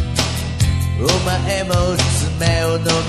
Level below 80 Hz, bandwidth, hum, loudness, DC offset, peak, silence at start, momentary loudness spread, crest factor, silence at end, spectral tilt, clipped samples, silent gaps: -24 dBFS; 14 kHz; none; -17 LUFS; 0.4%; 0 dBFS; 0 s; 3 LU; 16 dB; 0 s; -4.5 dB/octave; under 0.1%; none